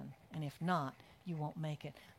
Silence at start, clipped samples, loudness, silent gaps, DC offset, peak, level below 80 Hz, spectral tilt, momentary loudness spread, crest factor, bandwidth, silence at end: 0 s; under 0.1%; -42 LUFS; none; under 0.1%; -22 dBFS; -74 dBFS; -7 dB/octave; 11 LU; 20 dB; 15.5 kHz; 0.05 s